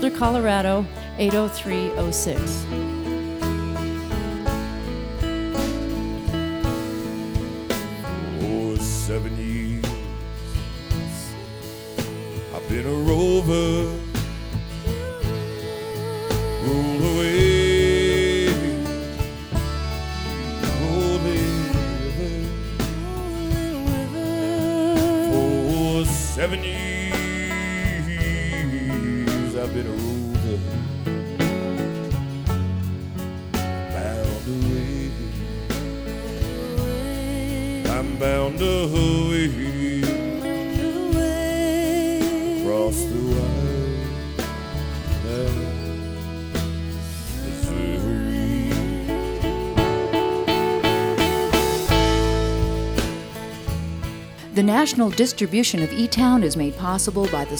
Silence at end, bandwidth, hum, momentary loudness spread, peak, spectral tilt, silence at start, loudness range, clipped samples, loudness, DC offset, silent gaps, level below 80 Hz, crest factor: 0 s; over 20 kHz; none; 10 LU; -4 dBFS; -5.5 dB/octave; 0 s; 6 LU; under 0.1%; -23 LUFS; under 0.1%; none; -32 dBFS; 20 dB